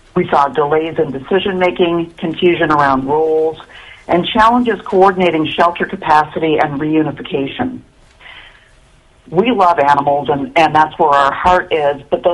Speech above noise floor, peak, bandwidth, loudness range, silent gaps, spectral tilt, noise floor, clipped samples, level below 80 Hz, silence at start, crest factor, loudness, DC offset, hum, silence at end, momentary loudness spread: 34 dB; 0 dBFS; 11 kHz; 5 LU; none; -6.5 dB/octave; -47 dBFS; under 0.1%; -44 dBFS; 0.15 s; 14 dB; -14 LUFS; under 0.1%; none; 0 s; 8 LU